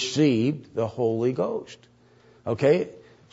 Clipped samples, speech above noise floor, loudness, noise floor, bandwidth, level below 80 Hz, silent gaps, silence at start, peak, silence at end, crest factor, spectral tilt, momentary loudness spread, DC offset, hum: under 0.1%; 32 dB; -25 LUFS; -56 dBFS; 8 kHz; -66 dBFS; none; 0 s; -8 dBFS; 0.35 s; 18 dB; -6 dB/octave; 14 LU; under 0.1%; none